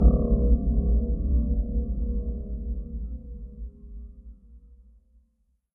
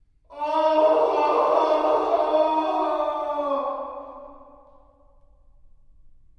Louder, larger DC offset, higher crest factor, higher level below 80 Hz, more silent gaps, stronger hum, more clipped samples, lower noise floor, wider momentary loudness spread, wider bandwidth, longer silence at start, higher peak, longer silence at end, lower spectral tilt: second, -28 LUFS vs -22 LUFS; neither; about the same, 20 dB vs 18 dB; first, -26 dBFS vs -58 dBFS; neither; neither; neither; first, -70 dBFS vs -54 dBFS; first, 19 LU vs 14 LU; second, 1.4 kHz vs 6.6 kHz; second, 0 s vs 0.3 s; about the same, -6 dBFS vs -6 dBFS; second, 1.05 s vs 2 s; first, -16 dB/octave vs -4.5 dB/octave